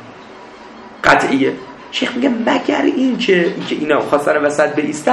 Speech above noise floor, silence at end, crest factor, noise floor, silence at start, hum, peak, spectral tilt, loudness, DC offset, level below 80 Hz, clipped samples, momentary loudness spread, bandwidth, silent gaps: 21 dB; 0 s; 16 dB; -36 dBFS; 0 s; none; 0 dBFS; -4.5 dB/octave; -15 LUFS; under 0.1%; -50 dBFS; under 0.1%; 23 LU; 12.5 kHz; none